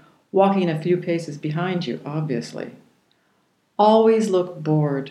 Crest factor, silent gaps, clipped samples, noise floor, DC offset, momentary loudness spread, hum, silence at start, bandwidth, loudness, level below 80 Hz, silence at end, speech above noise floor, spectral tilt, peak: 18 dB; none; under 0.1%; -65 dBFS; under 0.1%; 12 LU; none; 0.35 s; 11.5 kHz; -21 LUFS; -76 dBFS; 0 s; 45 dB; -7.5 dB/octave; -4 dBFS